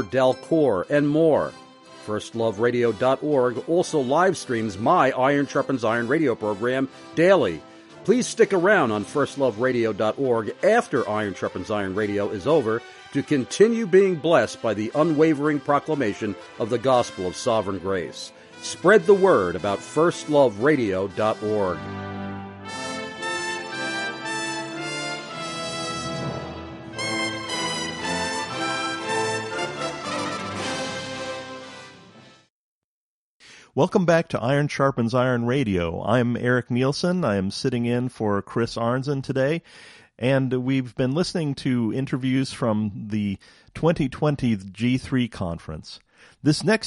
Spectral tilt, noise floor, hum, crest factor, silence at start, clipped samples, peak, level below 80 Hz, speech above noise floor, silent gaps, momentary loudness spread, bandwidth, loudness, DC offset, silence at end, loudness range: -5.5 dB/octave; under -90 dBFS; none; 20 dB; 0 s; under 0.1%; -4 dBFS; -56 dBFS; over 68 dB; 32.50-33.40 s; 12 LU; 11.5 kHz; -23 LUFS; under 0.1%; 0 s; 8 LU